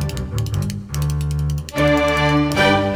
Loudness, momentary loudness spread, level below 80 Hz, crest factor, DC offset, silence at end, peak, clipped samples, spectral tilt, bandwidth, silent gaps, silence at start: -19 LUFS; 9 LU; -30 dBFS; 16 dB; under 0.1%; 0 s; -2 dBFS; under 0.1%; -5.5 dB/octave; over 20 kHz; none; 0 s